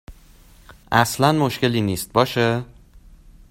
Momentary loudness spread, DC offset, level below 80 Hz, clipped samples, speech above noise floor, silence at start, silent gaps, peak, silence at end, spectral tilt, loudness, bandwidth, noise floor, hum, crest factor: 5 LU; under 0.1%; -48 dBFS; under 0.1%; 29 dB; 0.1 s; none; 0 dBFS; 0.85 s; -5 dB/octave; -20 LUFS; 16.5 kHz; -48 dBFS; none; 22 dB